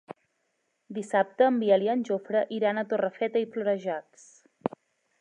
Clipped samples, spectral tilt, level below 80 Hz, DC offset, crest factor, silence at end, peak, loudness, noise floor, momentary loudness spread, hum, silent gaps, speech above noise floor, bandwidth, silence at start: under 0.1%; -6 dB/octave; -80 dBFS; under 0.1%; 20 dB; 0.5 s; -8 dBFS; -27 LUFS; -76 dBFS; 13 LU; none; none; 50 dB; 10.5 kHz; 0.1 s